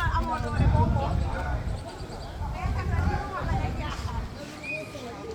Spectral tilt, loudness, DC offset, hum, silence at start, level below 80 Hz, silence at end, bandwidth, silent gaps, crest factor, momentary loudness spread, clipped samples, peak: -7 dB/octave; -30 LUFS; under 0.1%; none; 0 s; -32 dBFS; 0 s; 14 kHz; none; 18 dB; 13 LU; under 0.1%; -10 dBFS